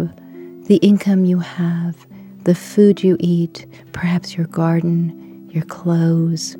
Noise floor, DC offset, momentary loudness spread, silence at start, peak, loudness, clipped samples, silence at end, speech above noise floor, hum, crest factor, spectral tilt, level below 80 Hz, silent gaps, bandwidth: -36 dBFS; under 0.1%; 21 LU; 0 s; 0 dBFS; -17 LUFS; under 0.1%; 0 s; 20 dB; none; 16 dB; -7.5 dB/octave; -58 dBFS; none; 16.5 kHz